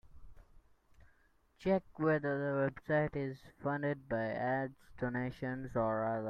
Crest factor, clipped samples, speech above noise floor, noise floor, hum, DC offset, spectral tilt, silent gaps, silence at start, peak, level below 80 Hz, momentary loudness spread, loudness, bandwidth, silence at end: 18 dB; under 0.1%; 34 dB; -70 dBFS; none; under 0.1%; -9 dB/octave; none; 0.05 s; -20 dBFS; -62 dBFS; 8 LU; -36 LUFS; 9.2 kHz; 0 s